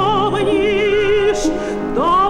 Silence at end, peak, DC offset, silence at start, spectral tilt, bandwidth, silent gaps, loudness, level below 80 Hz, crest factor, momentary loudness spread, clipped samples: 0 s; -6 dBFS; under 0.1%; 0 s; -5 dB/octave; 11 kHz; none; -16 LUFS; -34 dBFS; 10 dB; 5 LU; under 0.1%